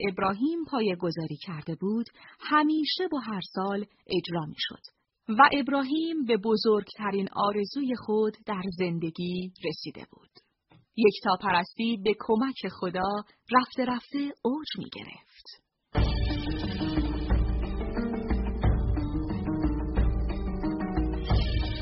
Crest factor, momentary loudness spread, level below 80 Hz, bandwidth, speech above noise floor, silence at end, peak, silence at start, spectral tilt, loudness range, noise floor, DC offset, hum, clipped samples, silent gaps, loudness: 22 dB; 10 LU; -36 dBFS; 5.8 kHz; 34 dB; 0 s; -6 dBFS; 0 s; -4.5 dB/octave; 5 LU; -63 dBFS; under 0.1%; none; under 0.1%; none; -29 LUFS